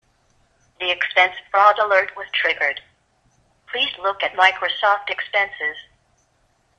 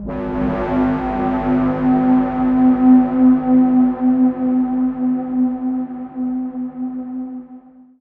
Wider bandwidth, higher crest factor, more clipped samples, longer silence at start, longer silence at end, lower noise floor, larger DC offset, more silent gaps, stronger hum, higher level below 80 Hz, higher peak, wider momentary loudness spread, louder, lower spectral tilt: first, 10 kHz vs 3.5 kHz; first, 22 dB vs 14 dB; neither; first, 0.8 s vs 0 s; first, 1 s vs 0.4 s; first, -63 dBFS vs -41 dBFS; neither; neither; neither; second, -64 dBFS vs -40 dBFS; about the same, 0 dBFS vs -2 dBFS; about the same, 11 LU vs 13 LU; about the same, -19 LUFS vs -17 LUFS; second, -1.5 dB/octave vs -10.5 dB/octave